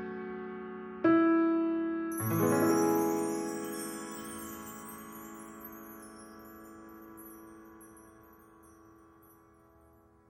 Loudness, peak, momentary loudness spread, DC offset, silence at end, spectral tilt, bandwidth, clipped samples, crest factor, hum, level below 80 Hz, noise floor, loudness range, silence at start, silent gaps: -31 LUFS; -16 dBFS; 23 LU; under 0.1%; 1.65 s; -5.5 dB/octave; 16.5 kHz; under 0.1%; 18 dB; none; -68 dBFS; -62 dBFS; 23 LU; 0 s; none